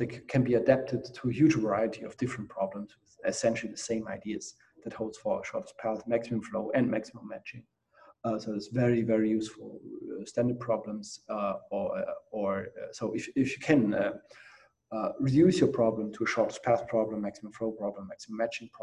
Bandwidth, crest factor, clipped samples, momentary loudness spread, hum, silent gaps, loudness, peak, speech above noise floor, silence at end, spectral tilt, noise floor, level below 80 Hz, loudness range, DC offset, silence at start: 11 kHz; 22 dB; under 0.1%; 15 LU; none; none; -31 LUFS; -10 dBFS; 30 dB; 0 s; -6.5 dB/octave; -61 dBFS; -64 dBFS; 6 LU; under 0.1%; 0 s